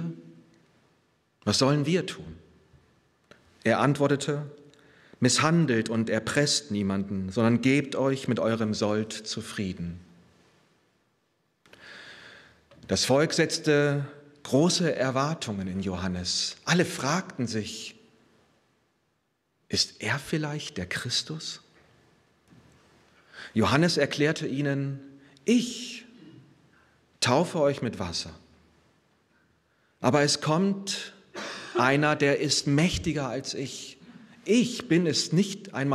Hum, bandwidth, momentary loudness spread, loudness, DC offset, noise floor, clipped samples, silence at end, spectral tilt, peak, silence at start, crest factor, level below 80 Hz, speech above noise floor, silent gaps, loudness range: none; 14.5 kHz; 16 LU; -26 LUFS; under 0.1%; -74 dBFS; under 0.1%; 0 s; -4.5 dB/octave; -6 dBFS; 0 s; 22 dB; -60 dBFS; 48 dB; none; 7 LU